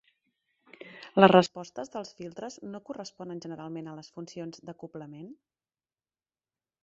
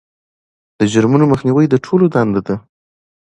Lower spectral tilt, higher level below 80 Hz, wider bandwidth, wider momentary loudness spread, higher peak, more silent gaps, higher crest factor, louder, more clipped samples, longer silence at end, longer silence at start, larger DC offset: second, -4.5 dB/octave vs -7.5 dB/octave; second, -72 dBFS vs -48 dBFS; second, 8 kHz vs 10.5 kHz; first, 25 LU vs 8 LU; about the same, -2 dBFS vs 0 dBFS; neither; first, 28 dB vs 14 dB; second, -25 LUFS vs -14 LUFS; neither; first, 1.5 s vs 0.7 s; about the same, 0.85 s vs 0.8 s; neither